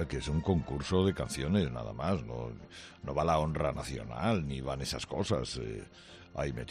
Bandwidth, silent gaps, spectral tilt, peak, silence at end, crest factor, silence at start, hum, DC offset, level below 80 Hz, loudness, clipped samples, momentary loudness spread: 13 kHz; none; -6 dB/octave; -16 dBFS; 0 s; 18 dB; 0 s; none; under 0.1%; -46 dBFS; -34 LUFS; under 0.1%; 14 LU